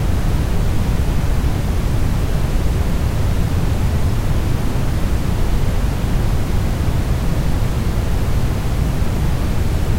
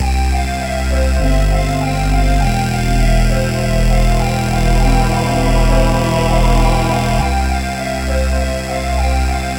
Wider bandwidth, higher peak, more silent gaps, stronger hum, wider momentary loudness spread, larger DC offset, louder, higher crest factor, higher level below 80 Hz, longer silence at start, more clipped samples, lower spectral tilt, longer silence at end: about the same, 16 kHz vs 16.5 kHz; second, -4 dBFS vs 0 dBFS; neither; neither; second, 1 LU vs 5 LU; neither; second, -20 LUFS vs -15 LUFS; about the same, 12 dB vs 12 dB; about the same, -18 dBFS vs -16 dBFS; about the same, 0 s vs 0 s; neither; about the same, -6.5 dB/octave vs -5.5 dB/octave; about the same, 0 s vs 0 s